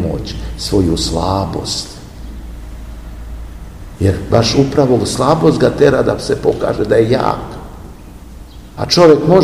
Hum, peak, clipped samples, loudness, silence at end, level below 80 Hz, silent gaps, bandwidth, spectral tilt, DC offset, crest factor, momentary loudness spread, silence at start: none; 0 dBFS; 0.5%; -13 LUFS; 0 s; -30 dBFS; none; 16 kHz; -5.5 dB/octave; 0.5%; 14 dB; 21 LU; 0 s